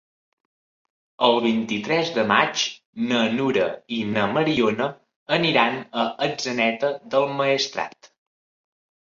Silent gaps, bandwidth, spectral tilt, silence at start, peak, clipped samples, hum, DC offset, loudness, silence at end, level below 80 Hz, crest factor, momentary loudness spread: 2.85-2.93 s, 5.16-5.26 s; 7.6 kHz; -4 dB/octave; 1.2 s; -2 dBFS; under 0.1%; none; under 0.1%; -22 LUFS; 1.15 s; -64 dBFS; 20 dB; 7 LU